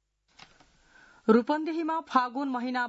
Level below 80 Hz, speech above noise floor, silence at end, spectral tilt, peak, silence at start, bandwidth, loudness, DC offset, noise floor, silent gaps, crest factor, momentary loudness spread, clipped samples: -72 dBFS; 34 dB; 0 s; -6.5 dB/octave; -8 dBFS; 1.25 s; 8 kHz; -28 LUFS; under 0.1%; -61 dBFS; none; 20 dB; 7 LU; under 0.1%